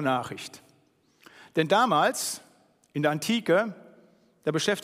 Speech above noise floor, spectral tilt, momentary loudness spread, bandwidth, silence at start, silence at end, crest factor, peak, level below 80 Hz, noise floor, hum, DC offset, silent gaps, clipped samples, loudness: 39 dB; -4 dB/octave; 15 LU; 15.5 kHz; 0 s; 0 s; 20 dB; -8 dBFS; -74 dBFS; -65 dBFS; none; under 0.1%; none; under 0.1%; -26 LUFS